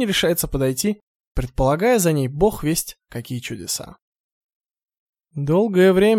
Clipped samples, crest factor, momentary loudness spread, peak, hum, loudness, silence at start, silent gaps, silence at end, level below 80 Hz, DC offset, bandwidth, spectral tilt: under 0.1%; 18 dB; 16 LU; -2 dBFS; none; -20 LUFS; 0 s; 1.02-1.35 s, 4.02-4.13 s, 4.20-4.61 s, 4.99-5.13 s; 0 s; -38 dBFS; under 0.1%; 17 kHz; -5 dB/octave